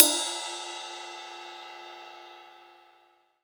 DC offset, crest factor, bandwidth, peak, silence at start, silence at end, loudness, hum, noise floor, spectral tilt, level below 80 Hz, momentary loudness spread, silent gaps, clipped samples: under 0.1%; 32 dB; over 20 kHz; 0 dBFS; 0 s; 0.7 s; -30 LUFS; none; -64 dBFS; 2 dB/octave; under -90 dBFS; 19 LU; none; under 0.1%